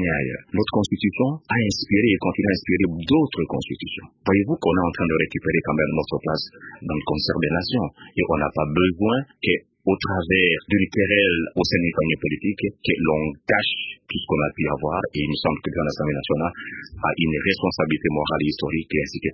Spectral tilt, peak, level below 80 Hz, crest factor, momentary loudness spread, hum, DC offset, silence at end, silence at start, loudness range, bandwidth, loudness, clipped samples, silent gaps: -6 dB/octave; -4 dBFS; -42 dBFS; 20 dB; 7 LU; none; under 0.1%; 0 s; 0 s; 3 LU; 7.6 kHz; -22 LUFS; under 0.1%; none